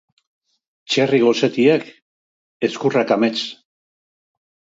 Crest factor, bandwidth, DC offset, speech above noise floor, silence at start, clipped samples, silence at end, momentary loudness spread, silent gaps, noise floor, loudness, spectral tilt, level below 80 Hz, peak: 18 dB; 7.8 kHz; under 0.1%; over 73 dB; 0.9 s; under 0.1%; 1.15 s; 9 LU; 2.02-2.60 s; under -90 dBFS; -18 LUFS; -5 dB/octave; -70 dBFS; -2 dBFS